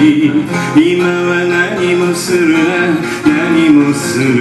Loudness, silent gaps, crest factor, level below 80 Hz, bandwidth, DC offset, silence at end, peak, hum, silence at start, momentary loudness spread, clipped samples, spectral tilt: -11 LUFS; none; 10 dB; -48 dBFS; 13.5 kHz; under 0.1%; 0 s; 0 dBFS; none; 0 s; 4 LU; 0.1%; -5.5 dB/octave